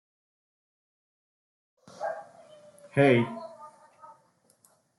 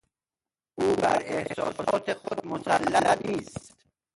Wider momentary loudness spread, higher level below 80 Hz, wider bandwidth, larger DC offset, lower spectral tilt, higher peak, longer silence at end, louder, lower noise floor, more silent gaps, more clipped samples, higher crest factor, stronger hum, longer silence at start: first, 22 LU vs 11 LU; second, -76 dBFS vs -60 dBFS; about the same, 12 kHz vs 11.5 kHz; neither; first, -7.5 dB/octave vs -4.5 dB/octave; about the same, -8 dBFS vs -8 dBFS; first, 1.3 s vs 0.5 s; about the same, -27 LUFS vs -27 LUFS; second, -66 dBFS vs under -90 dBFS; neither; neither; about the same, 24 dB vs 20 dB; neither; first, 2 s vs 0.75 s